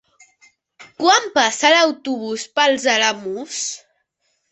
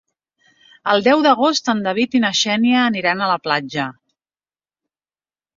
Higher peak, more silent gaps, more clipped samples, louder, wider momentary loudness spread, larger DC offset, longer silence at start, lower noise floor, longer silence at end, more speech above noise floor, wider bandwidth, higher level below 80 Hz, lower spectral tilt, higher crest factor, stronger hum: about the same, -2 dBFS vs -2 dBFS; neither; neither; about the same, -17 LUFS vs -17 LUFS; first, 13 LU vs 10 LU; neither; about the same, 0.8 s vs 0.85 s; second, -69 dBFS vs under -90 dBFS; second, 0.75 s vs 1.65 s; second, 52 dB vs over 73 dB; first, 8.4 kHz vs 7.6 kHz; about the same, -68 dBFS vs -64 dBFS; second, -0.5 dB/octave vs -3.5 dB/octave; about the same, 18 dB vs 18 dB; neither